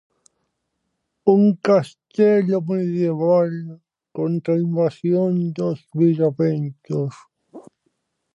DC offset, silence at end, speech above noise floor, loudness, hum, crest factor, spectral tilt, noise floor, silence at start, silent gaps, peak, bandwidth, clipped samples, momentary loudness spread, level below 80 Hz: under 0.1%; 0.75 s; 56 dB; -20 LUFS; none; 18 dB; -9.5 dB/octave; -75 dBFS; 1.25 s; none; -4 dBFS; 10.5 kHz; under 0.1%; 11 LU; -72 dBFS